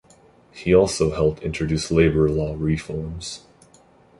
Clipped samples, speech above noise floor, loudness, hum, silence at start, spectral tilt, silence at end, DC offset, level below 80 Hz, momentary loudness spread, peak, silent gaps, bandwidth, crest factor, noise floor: under 0.1%; 33 dB; -21 LUFS; none; 0.55 s; -6 dB/octave; 0.8 s; under 0.1%; -38 dBFS; 14 LU; -4 dBFS; none; 11.5 kHz; 20 dB; -53 dBFS